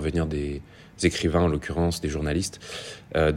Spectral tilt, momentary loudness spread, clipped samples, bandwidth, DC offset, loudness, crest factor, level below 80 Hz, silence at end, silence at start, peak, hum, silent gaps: -5.5 dB/octave; 13 LU; under 0.1%; 15.5 kHz; under 0.1%; -27 LUFS; 18 dB; -40 dBFS; 0 s; 0 s; -6 dBFS; none; none